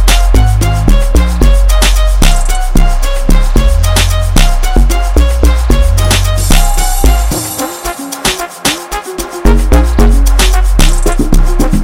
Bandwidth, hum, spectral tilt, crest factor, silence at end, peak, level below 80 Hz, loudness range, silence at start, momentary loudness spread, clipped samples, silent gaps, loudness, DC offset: 16.5 kHz; none; -4.5 dB/octave; 8 dB; 0 s; 0 dBFS; -8 dBFS; 2 LU; 0 s; 5 LU; 0.3%; none; -11 LUFS; 1%